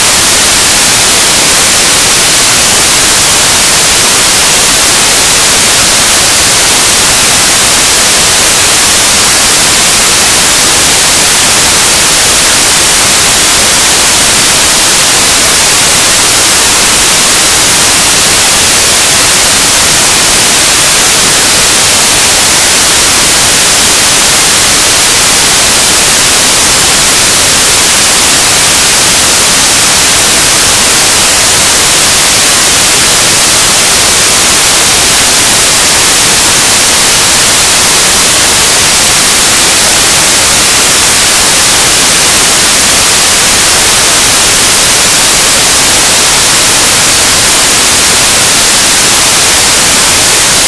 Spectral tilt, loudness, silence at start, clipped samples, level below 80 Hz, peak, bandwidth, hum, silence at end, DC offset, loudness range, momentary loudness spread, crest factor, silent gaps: 0 dB/octave; -2 LUFS; 0 s; 3%; -28 dBFS; 0 dBFS; 11 kHz; none; 0 s; under 0.1%; 0 LU; 0 LU; 6 dB; none